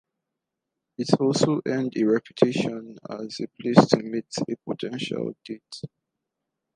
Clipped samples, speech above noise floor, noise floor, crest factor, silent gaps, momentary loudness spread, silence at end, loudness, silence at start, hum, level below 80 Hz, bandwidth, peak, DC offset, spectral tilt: under 0.1%; 60 dB; -84 dBFS; 26 dB; none; 18 LU; 0.9 s; -24 LUFS; 1 s; none; -66 dBFS; 11 kHz; 0 dBFS; under 0.1%; -6 dB/octave